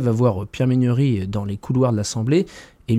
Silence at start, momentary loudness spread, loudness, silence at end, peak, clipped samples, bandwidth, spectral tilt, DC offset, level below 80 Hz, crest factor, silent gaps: 0 s; 8 LU; -20 LUFS; 0 s; -6 dBFS; under 0.1%; 11.5 kHz; -7 dB/octave; under 0.1%; -48 dBFS; 14 dB; none